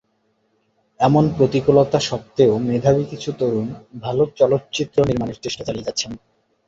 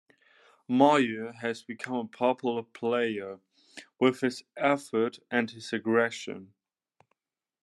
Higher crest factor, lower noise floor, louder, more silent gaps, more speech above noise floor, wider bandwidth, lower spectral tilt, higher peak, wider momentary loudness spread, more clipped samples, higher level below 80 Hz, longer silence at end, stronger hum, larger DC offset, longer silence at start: about the same, 18 dB vs 22 dB; second, -66 dBFS vs under -90 dBFS; first, -19 LUFS vs -29 LUFS; neither; second, 48 dB vs over 62 dB; second, 7.8 kHz vs 12 kHz; about the same, -6 dB/octave vs -5 dB/octave; first, -2 dBFS vs -8 dBFS; second, 11 LU vs 17 LU; neither; first, -48 dBFS vs -82 dBFS; second, 0.5 s vs 1.15 s; neither; neither; first, 1 s vs 0.7 s